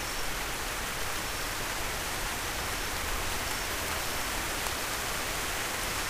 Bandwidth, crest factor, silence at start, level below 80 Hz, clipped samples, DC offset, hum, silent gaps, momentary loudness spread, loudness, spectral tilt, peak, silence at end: 16 kHz; 24 dB; 0 s; -42 dBFS; under 0.1%; under 0.1%; none; none; 2 LU; -32 LUFS; -1.5 dB/octave; -10 dBFS; 0 s